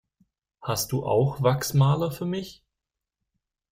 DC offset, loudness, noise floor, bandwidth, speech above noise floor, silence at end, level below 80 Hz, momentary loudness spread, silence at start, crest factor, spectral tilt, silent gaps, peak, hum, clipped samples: under 0.1%; -25 LUFS; -87 dBFS; 16 kHz; 63 dB; 1.2 s; -56 dBFS; 11 LU; 0.6 s; 18 dB; -6 dB/octave; none; -8 dBFS; none; under 0.1%